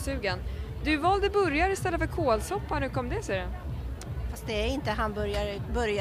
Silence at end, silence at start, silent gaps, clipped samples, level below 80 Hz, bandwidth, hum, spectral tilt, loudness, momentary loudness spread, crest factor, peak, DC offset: 0 s; 0 s; none; under 0.1%; -36 dBFS; 15.5 kHz; none; -5.5 dB/octave; -29 LUFS; 11 LU; 16 dB; -12 dBFS; under 0.1%